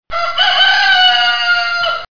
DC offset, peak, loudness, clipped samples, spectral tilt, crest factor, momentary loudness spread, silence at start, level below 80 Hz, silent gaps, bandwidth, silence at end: under 0.1%; 0 dBFS; -10 LUFS; under 0.1%; 0.5 dB/octave; 12 dB; 7 LU; 0 s; -48 dBFS; none; 5.4 kHz; 0.05 s